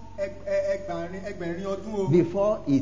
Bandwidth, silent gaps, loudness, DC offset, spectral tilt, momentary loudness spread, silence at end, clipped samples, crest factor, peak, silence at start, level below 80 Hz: 7.6 kHz; none; -27 LUFS; 0.8%; -8 dB/octave; 11 LU; 0 s; under 0.1%; 16 dB; -10 dBFS; 0 s; -50 dBFS